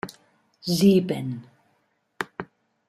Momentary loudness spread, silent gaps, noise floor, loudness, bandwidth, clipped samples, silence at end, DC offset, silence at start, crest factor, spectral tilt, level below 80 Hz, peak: 20 LU; none; -70 dBFS; -24 LUFS; 15 kHz; under 0.1%; 0.45 s; under 0.1%; 0.05 s; 20 dB; -6 dB/octave; -64 dBFS; -6 dBFS